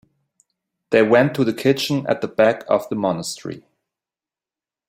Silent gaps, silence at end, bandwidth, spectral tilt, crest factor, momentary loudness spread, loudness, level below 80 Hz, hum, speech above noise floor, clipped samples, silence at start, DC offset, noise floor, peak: none; 1.3 s; 16 kHz; -5.5 dB/octave; 20 dB; 14 LU; -19 LUFS; -62 dBFS; none; over 72 dB; under 0.1%; 0.9 s; under 0.1%; under -90 dBFS; -2 dBFS